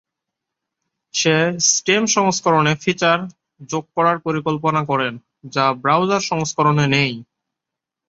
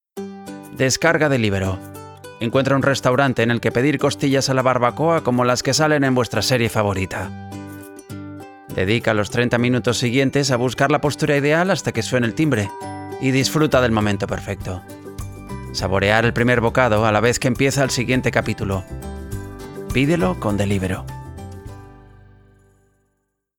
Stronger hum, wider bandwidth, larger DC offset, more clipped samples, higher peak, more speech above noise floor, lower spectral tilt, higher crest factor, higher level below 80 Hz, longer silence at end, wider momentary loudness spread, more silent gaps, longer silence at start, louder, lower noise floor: second, none vs 50 Hz at -50 dBFS; second, 7.8 kHz vs 19 kHz; neither; neither; about the same, -2 dBFS vs 0 dBFS; first, 66 dB vs 53 dB; second, -3.5 dB/octave vs -5 dB/octave; about the same, 18 dB vs 18 dB; second, -60 dBFS vs -42 dBFS; second, 0.85 s vs 1.6 s; second, 10 LU vs 18 LU; neither; first, 1.15 s vs 0.15 s; about the same, -18 LUFS vs -19 LUFS; first, -84 dBFS vs -72 dBFS